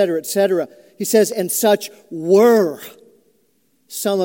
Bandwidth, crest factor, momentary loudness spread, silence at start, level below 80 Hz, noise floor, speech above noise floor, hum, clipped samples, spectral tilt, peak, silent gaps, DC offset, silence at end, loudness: 17 kHz; 16 dB; 18 LU; 0 s; -76 dBFS; -63 dBFS; 46 dB; none; under 0.1%; -4 dB/octave; -2 dBFS; none; under 0.1%; 0 s; -17 LUFS